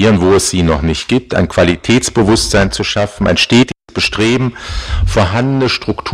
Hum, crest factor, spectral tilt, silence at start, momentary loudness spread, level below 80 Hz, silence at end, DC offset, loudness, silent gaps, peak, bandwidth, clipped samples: none; 12 dB; -4.5 dB/octave; 0 s; 6 LU; -26 dBFS; 0 s; under 0.1%; -12 LUFS; none; 0 dBFS; 15.5 kHz; under 0.1%